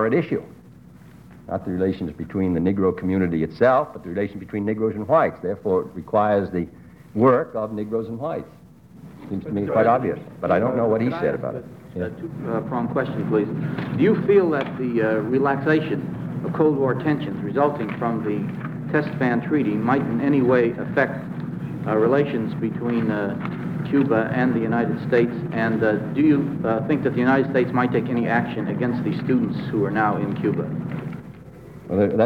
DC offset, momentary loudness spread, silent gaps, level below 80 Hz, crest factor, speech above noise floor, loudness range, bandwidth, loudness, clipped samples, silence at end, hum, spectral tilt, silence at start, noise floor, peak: under 0.1%; 11 LU; none; -54 dBFS; 18 dB; 24 dB; 3 LU; 6.8 kHz; -22 LUFS; under 0.1%; 0 s; none; -9.5 dB/octave; 0 s; -45 dBFS; -4 dBFS